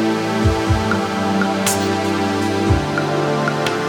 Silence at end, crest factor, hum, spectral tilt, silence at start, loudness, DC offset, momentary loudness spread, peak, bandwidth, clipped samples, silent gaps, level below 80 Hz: 0 s; 14 dB; none; -5 dB/octave; 0 s; -18 LUFS; under 0.1%; 2 LU; -4 dBFS; over 20 kHz; under 0.1%; none; -32 dBFS